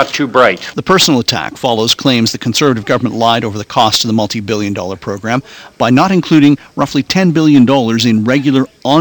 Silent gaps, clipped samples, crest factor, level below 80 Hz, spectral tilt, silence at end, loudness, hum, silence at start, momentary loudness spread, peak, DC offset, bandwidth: none; 0.3%; 12 dB; -48 dBFS; -4.5 dB/octave; 0 s; -11 LUFS; none; 0 s; 8 LU; 0 dBFS; under 0.1%; 19.5 kHz